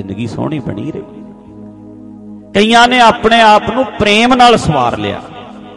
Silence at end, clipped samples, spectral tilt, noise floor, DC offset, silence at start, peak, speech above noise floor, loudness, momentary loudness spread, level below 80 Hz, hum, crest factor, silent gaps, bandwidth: 0 s; 0.1%; -4.5 dB/octave; -33 dBFS; under 0.1%; 0 s; 0 dBFS; 23 dB; -10 LUFS; 18 LU; -38 dBFS; none; 12 dB; none; 11.5 kHz